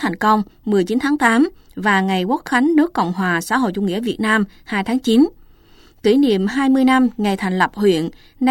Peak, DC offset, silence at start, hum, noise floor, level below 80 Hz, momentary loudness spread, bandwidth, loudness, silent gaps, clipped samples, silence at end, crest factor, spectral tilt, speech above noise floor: -2 dBFS; under 0.1%; 0 s; none; -48 dBFS; -50 dBFS; 6 LU; 16.5 kHz; -17 LUFS; none; under 0.1%; 0 s; 16 dB; -5.5 dB/octave; 31 dB